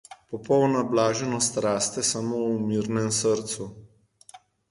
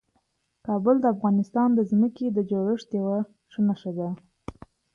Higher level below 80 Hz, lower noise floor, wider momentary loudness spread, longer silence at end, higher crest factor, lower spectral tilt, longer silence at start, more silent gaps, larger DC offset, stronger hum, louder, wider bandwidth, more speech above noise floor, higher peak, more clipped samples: about the same, -62 dBFS vs -62 dBFS; second, -52 dBFS vs -72 dBFS; second, 11 LU vs 16 LU; about the same, 0.35 s vs 0.45 s; about the same, 18 dB vs 16 dB; second, -4 dB/octave vs -9.5 dB/octave; second, 0.1 s vs 0.65 s; neither; neither; neither; about the same, -25 LUFS vs -25 LUFS; first, 11.5 kHz vs 6.8 kHz; second, 27 dB vs 48 dB; about the same, -8 dBFS vs -10 dBFS; neither